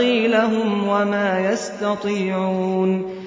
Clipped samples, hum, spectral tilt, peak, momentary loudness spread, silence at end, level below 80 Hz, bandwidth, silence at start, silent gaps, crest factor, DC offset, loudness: under 0.1%; none; -6 dB/octave; -6 dBFS; 5 LU; 0 s; -62 dBFS; 7.8 kHz; 0 s; none; 14 dB; under 0.1%; -20 LUFS